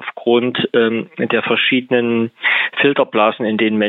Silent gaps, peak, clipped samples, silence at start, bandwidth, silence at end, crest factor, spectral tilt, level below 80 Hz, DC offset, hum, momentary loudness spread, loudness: none; -2 dBFS; under 0.1%; 0 s; 4.2 kHz; 0 s; 14 dB; -8 dB/octave; -70 dBFS; under 0.1%; none; 4 LU; -16 LUFS